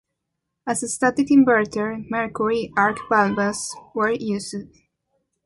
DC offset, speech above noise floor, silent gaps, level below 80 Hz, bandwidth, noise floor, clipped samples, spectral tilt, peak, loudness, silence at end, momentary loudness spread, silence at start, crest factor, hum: under 0.1%; 59 dB; none; -58 dBFS; 11.5 kHz; -79 dBFS; under 0.1%; -4.5 dB/octave; -4 dBFS; -21 LUFS; 0.8 s; 13 LU; 0.65 s; 18 dB; none